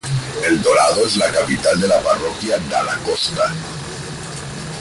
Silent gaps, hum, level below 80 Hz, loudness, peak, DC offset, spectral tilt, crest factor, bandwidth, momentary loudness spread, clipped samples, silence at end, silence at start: none; none; -44 dBFS; -17 LUFS; -2 dBFS; under 0.1%; -4 dB/octave; 16 dB; 11.5 kHz; 14 LU; under 0.1%; 0 s; 0.05 s